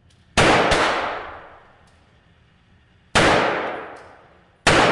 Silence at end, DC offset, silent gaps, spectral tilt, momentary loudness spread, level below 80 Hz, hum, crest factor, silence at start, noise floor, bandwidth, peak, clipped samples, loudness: 0 s; under 0.1%; none; -3.5 dB/octave; 19 LU; -40 dBFS; none; 18 dB; 0.35 s; -56 dBFS; 11.5 kHz; -4 dBFS; under 0.1%; -18 LUFS